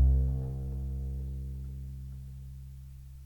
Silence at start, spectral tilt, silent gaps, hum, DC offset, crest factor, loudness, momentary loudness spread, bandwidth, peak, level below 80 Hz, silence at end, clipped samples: 0 s; -10 dB/octave; none; none; under 0.1%; 18 dB; -37 LUFS; 16 LU; 1.1 kHz; -16 dBFS; -34 dBFS; 0 s; under 0.1%